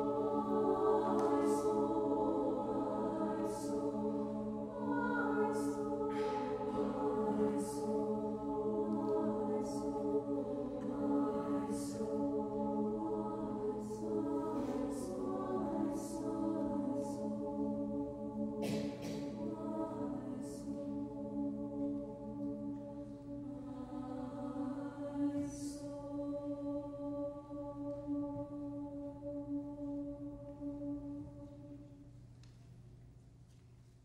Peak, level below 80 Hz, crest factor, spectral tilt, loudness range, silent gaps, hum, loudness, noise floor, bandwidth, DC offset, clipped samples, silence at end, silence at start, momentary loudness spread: -20 dBFS; -64 dBFS; 18 dB; -7 dB/octave; 7 LU; none; none; -39 LUFS; -61 dBFS; 13 kHz; under 0.1%; under 0.1%; 0.05 s; 0 s; 11 LU